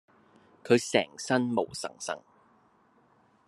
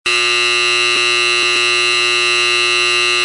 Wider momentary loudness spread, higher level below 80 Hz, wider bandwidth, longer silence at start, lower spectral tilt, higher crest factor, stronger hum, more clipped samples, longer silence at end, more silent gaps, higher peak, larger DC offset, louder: first, 14 LU vs 0 LU; second, -76 dBFS vs -62 dBFS; about the same, 12.5 kHz vs 11.5 kHz; first, 0.65 s vs 0.05 s; first, -4 dB/octave vs 0 dB/octave; first, 24 dB vs 12 dB; neither; neither; first, 1.3 s vs 0 s; neither; second, -8 dBFS vs -2 dBFS; neither; second, -29 LUFS vs -11 LUFS